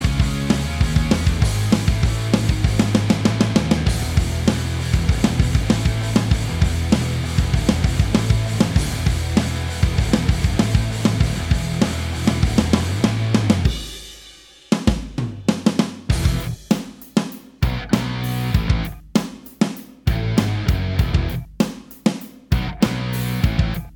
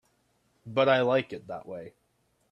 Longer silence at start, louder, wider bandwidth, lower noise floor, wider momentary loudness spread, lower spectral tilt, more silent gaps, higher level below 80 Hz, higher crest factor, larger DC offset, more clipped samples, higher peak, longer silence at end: second, 0 s vs 0.65 s; first, -20 LUFS vs -26 LUFS; first, over 20 kHz vs 7 kHz; second, -44 dBFS vs -71 dBFS; second, 5 LU vs 18 LU; about the same, -6 dB/octave vs -7 dB/octave; neither; first, -26 dBFS vs -72 dBFS; about the same, 18 dB vs 20 dB; neither; neither; first, -2 dBFS vs -10 dBFS; second, 0.05 s vs 0.6 s